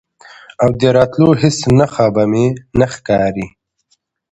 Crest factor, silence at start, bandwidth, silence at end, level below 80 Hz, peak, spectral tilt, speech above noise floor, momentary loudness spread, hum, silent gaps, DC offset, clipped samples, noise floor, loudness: 14 dB; 0.6 s; 10.5 kHz; 0.85 s; -40 dBFS; 0 dBFS; -6.5 dB/octave; 50 dB; 5 LU; none; none; under 0.1%; under 0.1%; -62 dBFS; -13 LUFS